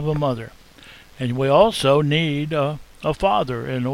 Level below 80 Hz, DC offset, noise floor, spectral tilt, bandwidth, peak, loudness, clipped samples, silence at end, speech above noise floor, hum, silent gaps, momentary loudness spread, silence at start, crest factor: -44 dBFS; under 0.1%; -45 dBFS; -6 dB/octave; 15.5 kHz; -2 dBFS; -20 LUFS; under 0.1%; 0 s; 26 dB; none; none; 12 LU; 0 s; 20 dB